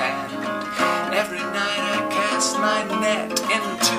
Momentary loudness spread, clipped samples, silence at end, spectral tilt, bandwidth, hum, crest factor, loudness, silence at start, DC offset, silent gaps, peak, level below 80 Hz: 6 LU; under 0.1%; 0 s; -2 dB/octave; 16 kHz; none; 18 dB; -22 LUFS; 0 s; under 0.1%; none; -4 dBFS; -62 dBFS